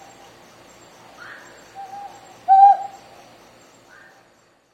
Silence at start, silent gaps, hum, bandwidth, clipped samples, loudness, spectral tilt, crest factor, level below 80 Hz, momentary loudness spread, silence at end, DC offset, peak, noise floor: 1.8 s; none; none; 8.4 kHz; under 0.1%; -14 LUFS; -3 dB/octave; 20 dB; -70 dBFS; 29 LU; 1.85 s; under 0.1%; -2 dBFS; -57 dBFS